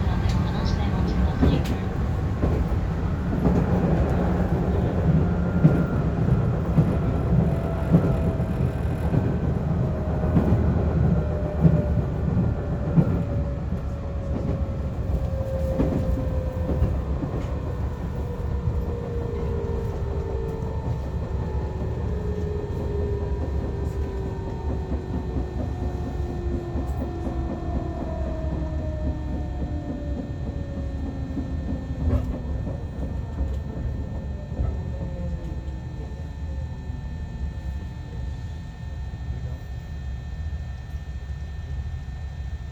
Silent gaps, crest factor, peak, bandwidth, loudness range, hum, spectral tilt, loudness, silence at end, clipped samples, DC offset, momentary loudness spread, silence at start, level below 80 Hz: none; 22 dB; -2 dBFS; 7.8 kHz; 11 LU; none; -9 dB/octave; -26 LUFS; 0 s; under 0.1%; under 0.1%; 12 LU; 0 s; -30 dBFS